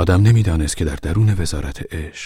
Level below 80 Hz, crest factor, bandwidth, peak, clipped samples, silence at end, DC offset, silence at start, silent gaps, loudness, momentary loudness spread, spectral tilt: -28 dBFS; 16 dB; 13 kHz; 0 dBFS; under 0.1%; 0 s; under 0.1%; 0 s; none; -18 LUFS; 14 LU; -6 dB/octave